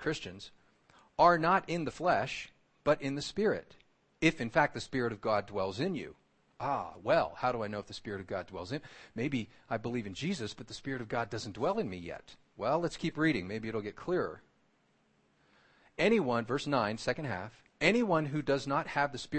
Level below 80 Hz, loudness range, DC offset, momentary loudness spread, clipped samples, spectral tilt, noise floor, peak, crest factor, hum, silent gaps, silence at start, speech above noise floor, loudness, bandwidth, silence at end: -60 dBFS; 6 LU; under 0.1%; 13 LU; under 0.1%; -5.5 dB/octave; -71 dBFS; -12 dBFS; 22 dB; none; none; 0 s; 39 dB; -33 LUFS; 8.8 kHz; 0 s